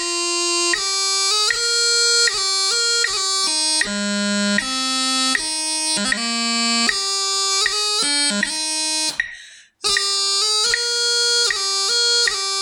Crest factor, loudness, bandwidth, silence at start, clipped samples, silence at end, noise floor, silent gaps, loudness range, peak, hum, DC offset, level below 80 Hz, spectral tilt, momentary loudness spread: 16 dB; -17 LUFS; over 20 kHz; 0 s; under 0.1%; 0 s; -43 dBFS; none; 2 LU; -4 dBFS; none; under 0.1%; -56 dBFS; 0 dB/octave; 5 LU